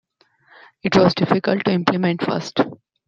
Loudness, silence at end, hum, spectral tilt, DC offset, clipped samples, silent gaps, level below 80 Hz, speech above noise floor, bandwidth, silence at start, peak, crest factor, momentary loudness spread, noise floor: -19 LUFS; 0.3 s; none; -6.5 dB/octave; under 0.1%; under 0.1%; none; -54 dBFS; 39 dB; 7.6 kHz; 0.85 s; -2 dBFS; 18 dB; 7 LU; -57 dBFS